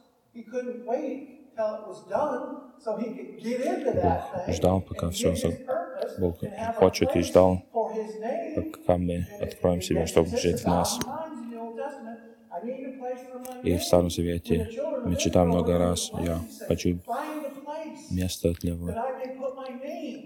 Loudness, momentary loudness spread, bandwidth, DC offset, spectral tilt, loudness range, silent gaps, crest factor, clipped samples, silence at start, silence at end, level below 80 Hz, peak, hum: -28 LUFS; 14 LU; 19 kHz; under 0.1%; -5.5 dB/octave; 6 LU; none; 22 dB; under 0.1%; 0.35 s; 0 s; -48 dBFS; -6 dBFS; none